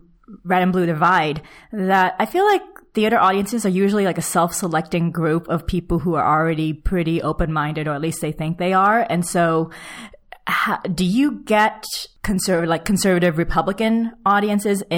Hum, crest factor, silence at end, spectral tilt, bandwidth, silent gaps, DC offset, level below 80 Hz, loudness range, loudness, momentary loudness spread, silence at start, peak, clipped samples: none; 14 dB; 0 s; -5.5 dB/octave; 18.5 kHz; none; under 0.1%; -38 dBFS; 2 LU; -19 LUFS; 8 LU; 0.3 s; -4 dBFS; under 0.1%